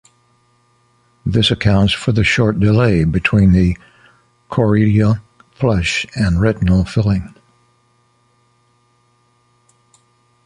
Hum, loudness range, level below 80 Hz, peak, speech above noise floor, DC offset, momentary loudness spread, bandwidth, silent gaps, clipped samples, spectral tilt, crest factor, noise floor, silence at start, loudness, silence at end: none; 7 LU; -32 dBFS; 0 dBFS; 45 dB; under 0.1%; 8 LU; 10.5 kHz; none; under 0.1%; -6.5 dB/octave; 16 dB; -58 dBFS; 1.25 s; -15 LUFS; 3.2 s